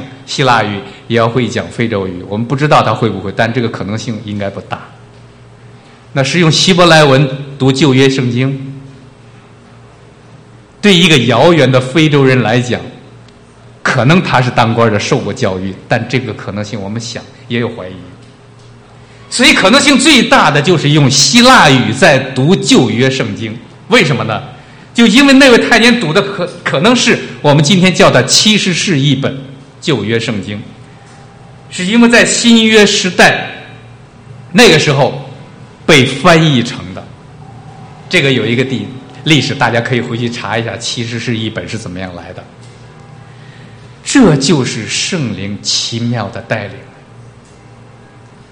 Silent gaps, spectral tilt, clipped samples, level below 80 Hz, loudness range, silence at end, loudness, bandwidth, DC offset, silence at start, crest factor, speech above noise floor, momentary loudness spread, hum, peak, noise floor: none; -4.5 dB/octave; 1%; -42 dBFS; 9 LU; 1.2 s; -10 LUFS; over 20 kHz; under 0.1%; 0 s; 12 dB; 28 dB; 16 LU; none; 0 dBFS; -38 dBFS